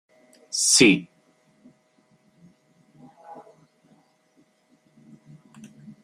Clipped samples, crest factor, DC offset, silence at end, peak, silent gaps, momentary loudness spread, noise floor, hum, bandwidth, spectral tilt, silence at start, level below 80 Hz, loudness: under 0.1%; 26 dB; under 0.1%; 0.15 s; -2 dBFS; none; 31 LU; -63 dBFS; none; 16 kHz; -2 dB/octave; 0.55 s; -66 dBFS; -18 LUFS